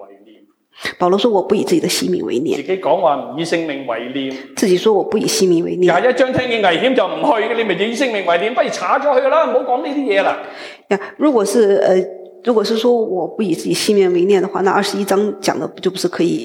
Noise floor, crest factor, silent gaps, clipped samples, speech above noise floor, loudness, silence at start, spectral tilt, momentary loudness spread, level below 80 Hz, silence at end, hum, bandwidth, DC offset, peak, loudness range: -49 dBFS; 14 dB; none; under 0.1%; 33 dB; -16 LUFS; 0 s; -4.5 dB/octave; 8 LU; -62 dBFS; 0 s; none; 17 kHz; under 0.1%; -2 dBFS; 2 LU